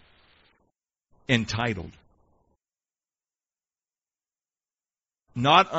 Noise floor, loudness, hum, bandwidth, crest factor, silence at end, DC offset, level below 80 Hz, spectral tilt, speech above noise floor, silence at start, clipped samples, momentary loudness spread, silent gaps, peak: under -90 dBFS; -24 LUFS; none; 8 kHz; 26 dB; 0 s; under 0.1%; -58 dBFS; -3 dB/octave; over 67 dB; 1.3 s; under 0.1%; 23 LU; none; -4 dBFS